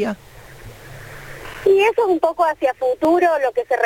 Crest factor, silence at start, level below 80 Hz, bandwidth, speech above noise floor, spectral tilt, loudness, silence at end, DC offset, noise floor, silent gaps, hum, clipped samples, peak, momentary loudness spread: 16 dB; 0 s; -48 dBFS; 17 kHz; 21 dB; -5.5 dB/octave; -17 LUFS; 0 s; under 0.1%; -38 dBFS; none; none; under 0.1%; -4 dBFS; 22 LU